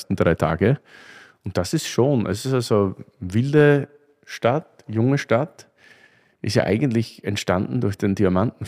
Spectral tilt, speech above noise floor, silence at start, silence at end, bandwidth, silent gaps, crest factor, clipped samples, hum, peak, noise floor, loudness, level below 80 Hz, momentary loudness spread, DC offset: -6.5 dB/octave; 35 dB; 0 s; 0 s; 15.5 kHz; none; 18 dB; under 0.1%; none; -4 dBFS; -55 dBFS; -21 LUFS; -50 dBFS; 9 LU; under 0.1%